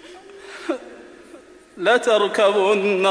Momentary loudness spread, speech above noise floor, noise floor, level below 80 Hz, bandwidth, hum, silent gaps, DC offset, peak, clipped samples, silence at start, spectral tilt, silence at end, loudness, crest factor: 22 LU; 28 dB; -45 dBFS; -66 dBFS; 11 kHz; none; none; under 0.1%; -4 dBFS; under 0.1%; 0.05 s; -3.5 dB/octave; 0 s; -19 LUFS; 16 dB